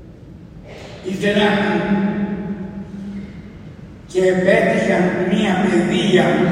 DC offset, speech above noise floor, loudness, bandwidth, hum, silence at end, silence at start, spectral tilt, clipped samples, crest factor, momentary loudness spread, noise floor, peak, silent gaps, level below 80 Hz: under 0.1%; 22 dB; -17 LUFS; 11 kHz; none; 0 s; 0 s; -6 dB/octave; under 0.1%; 16 dB; 22 LU; -38 dBFS; -2 dBFS; none; -46 dBFS